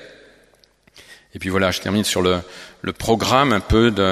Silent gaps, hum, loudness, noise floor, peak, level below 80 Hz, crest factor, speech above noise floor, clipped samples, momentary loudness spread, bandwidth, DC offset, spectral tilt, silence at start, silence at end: none; none; -19 LUFS; -56 dBFS; 0 dBFS; -36 dBFS; 20 dB; 37 dB; under 0.1%; 14 LU; 15 kHz; under 0.1%; -4.5 dB/octave; 0 s; 0 s